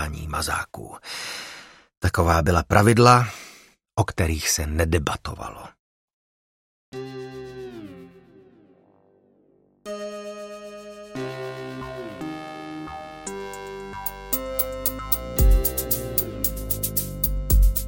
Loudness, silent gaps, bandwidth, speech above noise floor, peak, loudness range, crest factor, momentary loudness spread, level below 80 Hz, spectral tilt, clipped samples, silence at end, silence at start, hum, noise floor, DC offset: -23 LUFS; 1.97-2.01 s, 5.79-6.92 s; 17 kHz; 40 dB; -2 dBFS; 20 LU; 24 dB; 19 LU; -30 dBFS; -4.5 dB/octave; under 0.1%; 0 s; 0 s; none; -61 dBFS; under 0.1%